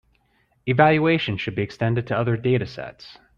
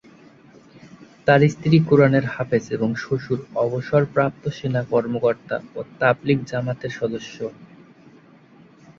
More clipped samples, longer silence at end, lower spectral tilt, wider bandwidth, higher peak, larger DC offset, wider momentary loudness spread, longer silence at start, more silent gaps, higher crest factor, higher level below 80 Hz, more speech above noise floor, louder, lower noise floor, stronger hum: neither; second, 0.25 s vs 1.35 s; about the same, -8 dB/octave vs -7.5 dB/octave; about the same, 7 kHz vs 7.4 kHz; about the same, -4 dBFS vs -2 dBFS; neither; first, 16 LU vs 12 LU; second, 0.65 s vs 0.85 s; neither; about the same, 18 dB vs 20 dB; about the same, -54 dBFS vs -56 dBFS; first, 43 dB vs 29 dB; about the same, -21 LUFS vs -21 LUFS; first, -65 dBFS vs -50 dBFS; neither